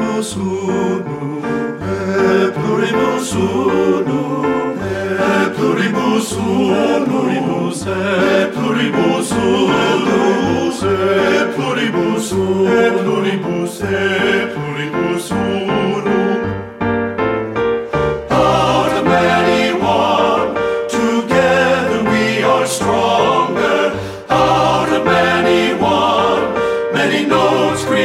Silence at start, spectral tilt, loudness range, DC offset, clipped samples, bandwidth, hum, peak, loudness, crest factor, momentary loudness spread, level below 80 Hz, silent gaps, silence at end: 0 s; -5 dB/octave; 3 LU; under 0.1%; under 0.1%; 15.5 kHz; none; 0 dBFS; -15 LUFS; 14 dB; 6 LU; -44 dBFS; none; 0 s